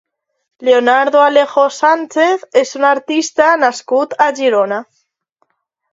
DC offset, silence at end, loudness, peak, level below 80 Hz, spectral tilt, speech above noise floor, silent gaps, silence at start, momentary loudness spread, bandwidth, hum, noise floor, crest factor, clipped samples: under 0.1%; 1.1 s; -13 LUFS; 0 dBFS; -68 dBFS; -2.5 dB/octave; 52 dB; none; 0.6 s; 6 LU; 7.8 kHz; none; -64 dBFS; 14 dB; under 0.1%